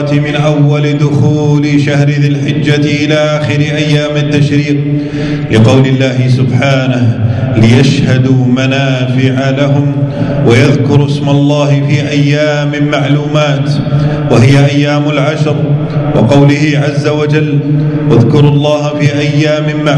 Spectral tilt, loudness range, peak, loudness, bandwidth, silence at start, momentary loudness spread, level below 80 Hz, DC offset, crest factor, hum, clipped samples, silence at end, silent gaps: -7 dB/octave; 1 LU; 0 dBFS; -9 LUFS; 9.2 kHz; 0 s; 5 LU; -38 dBFS; under 0.1%; 8 dB; none; 2%; 0 s; none